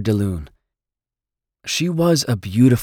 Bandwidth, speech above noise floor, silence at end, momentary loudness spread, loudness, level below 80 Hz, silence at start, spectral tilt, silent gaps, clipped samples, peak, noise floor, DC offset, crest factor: 17.5 kHz; 71 dB; 0 s; 12 LU; -19 LUFS; -44 dBFS; 0 s; -5.5 dB/octave; none; under 0.1%; -2 dBFS; -88 dBFS; under 0.1%; 16 dB